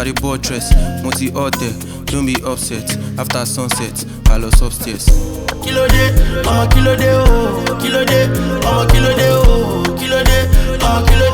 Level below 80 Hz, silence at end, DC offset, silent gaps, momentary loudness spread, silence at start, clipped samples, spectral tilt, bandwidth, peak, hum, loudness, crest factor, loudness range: -16 dBFS; 0 s; under 0.1%; none; 8 LU; 0 s; 0.2%; -5 dB/octave; 19.5 kHz; 0 dBFS; none; -15 LUFS; 12 dB; 5 LU